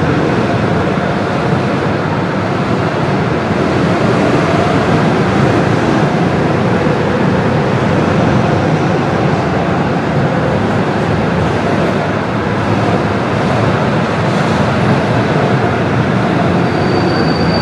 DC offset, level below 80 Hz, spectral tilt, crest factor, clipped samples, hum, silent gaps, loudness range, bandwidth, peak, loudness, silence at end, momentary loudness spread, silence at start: under 0.1%; -36 dBFS; -7 dB/octave; 12 dB; under 0.1%; none; none; 2 LU; 11.5 kHz; 0 dBFS; -13 LUFS; 0 s; 3 LU; 0 s